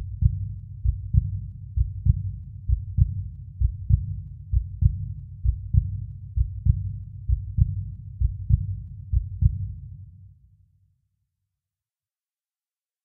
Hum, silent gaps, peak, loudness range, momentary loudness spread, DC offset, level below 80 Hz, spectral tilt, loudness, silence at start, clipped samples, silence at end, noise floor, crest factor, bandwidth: none; none; -6 dBFS; 5 LU; 11 LU; under 0.1%; -30 dBFS; -15 dB/octave; -27 LUFS; 0 s; under 0.1%; 2.75 s; under -90 dBFS; 22 dB; 0.4 kHz